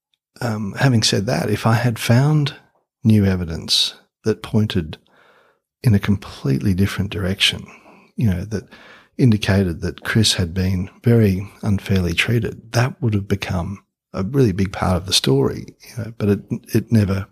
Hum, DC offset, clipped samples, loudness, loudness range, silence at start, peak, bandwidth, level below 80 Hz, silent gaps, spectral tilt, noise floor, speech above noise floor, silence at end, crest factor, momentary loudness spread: none; under 0.1%; under 0.1%; -19 LUFS; 3 LU; 0.4 s; -2 dBFS; 15.5 kHz; -44 dBFS; none; -5.5 dB/octave; -58 dBFS; 40 dB; 0.05 s; 18 dB; 11 LU